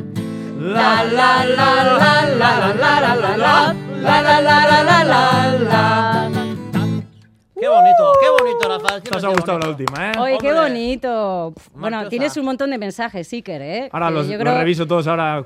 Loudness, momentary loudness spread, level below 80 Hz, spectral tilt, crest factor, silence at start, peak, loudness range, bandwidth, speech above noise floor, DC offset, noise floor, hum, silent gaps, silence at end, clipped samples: -15 LUFS; 14 LU; -52 dBFS; -5.5 dB/octave; 16 dB; 0 s; 0 dBFS; 8 LU; 16 kHz; 32 dB; under 0.1%; -48 dBFS; none; none; 0 s; under 0.1%